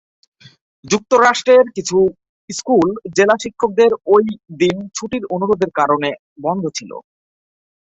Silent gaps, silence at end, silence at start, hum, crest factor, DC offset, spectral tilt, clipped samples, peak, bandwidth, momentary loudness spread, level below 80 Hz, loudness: 2.29-2.48 s, 6.19-6.36 s; 0.9 s; 0.85 s; none; 16 dB; under 0.1%; -4.5 dB/octave; under 0.1%; 0 dBFS; 8.2 kHz; 12 LU; -56 dBFS; -16 LUFS